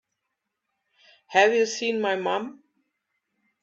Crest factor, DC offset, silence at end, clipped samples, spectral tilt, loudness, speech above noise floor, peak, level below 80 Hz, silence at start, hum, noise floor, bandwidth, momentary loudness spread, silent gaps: 22 dB; under 0.1%; 1.1 s; under 0.1%; -3 dB/octave; -23 LUFS; 58 dB; -6 dBFS; -78 dBFS; 1.3 s; none; -82 dBFS; 7.8 kHz; 10 LU; none